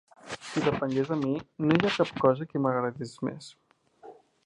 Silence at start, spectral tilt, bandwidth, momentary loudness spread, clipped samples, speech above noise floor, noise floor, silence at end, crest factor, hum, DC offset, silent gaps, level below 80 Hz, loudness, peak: 0.25 s; -6.5 dB/octave; 11 kHz; 14 LU; under 0.1%; 25 dB; -52 dBFS; 0.3 s; 24 dB; none; under 0.1%; none; -62 dBFS; -28 LUFS; -6 dBFS